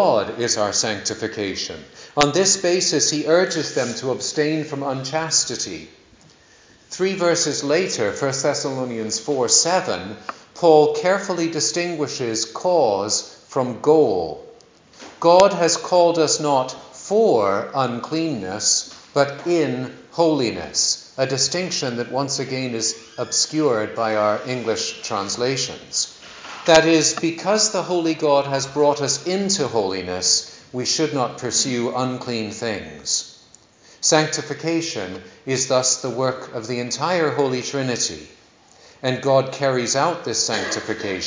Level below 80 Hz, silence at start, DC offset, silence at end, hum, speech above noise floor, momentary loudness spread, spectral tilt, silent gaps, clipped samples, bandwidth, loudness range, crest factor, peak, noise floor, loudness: -58 dBFS; 0 s; under 0.1%; 0 s; none; 31 dB; 10 LU; -3 dB/octave; none; under 0.1%; 7.8 kHz; 4 LU; 20 dB; 0 dBFS; -51 dBFS; -20 LUFS